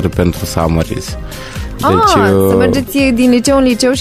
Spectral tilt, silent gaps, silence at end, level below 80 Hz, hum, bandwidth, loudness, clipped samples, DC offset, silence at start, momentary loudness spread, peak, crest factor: -5.5 dB/octave; none; 0 s; -28 dBFS; none; 15.5 kHz; -11 LUFS; under 0.1%; under 0.1%; 0 s; 15 LU; 0 dBFS; 12 dB